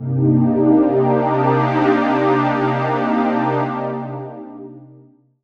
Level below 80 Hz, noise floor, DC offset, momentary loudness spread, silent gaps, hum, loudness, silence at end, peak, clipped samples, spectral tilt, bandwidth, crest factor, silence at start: -60 dBFS; -48 dBFS; 0.1%; 17 LU; none; none; -17 LUFS; 0.55 s; -2 dBFS; under 0.1%; -9.5 dB/octave; 6.6 kHz; 14 dB; 0 s